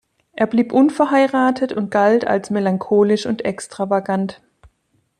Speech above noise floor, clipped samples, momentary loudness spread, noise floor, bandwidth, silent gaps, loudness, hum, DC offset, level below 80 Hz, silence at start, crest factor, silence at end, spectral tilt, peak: 48 dB; under 0.1%; 8 LU; -65 dBFS; 11 kHz; none; -18 LUFS; none; under 0.1%; -60 dBFS; 0.35 s; 14 dB; 0.85 s; -6.5 dB/octave; -4 dBFS